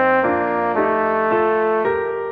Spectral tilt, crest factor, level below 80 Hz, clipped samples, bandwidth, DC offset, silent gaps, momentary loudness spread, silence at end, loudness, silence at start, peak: -8.5 dB/octave; 14 dB; -54 dBFS; under 0.1%; 5 kHz; under 0.1%; none; 2 LU; 0 s; -18 LUFS; 0 s; -4 dBFS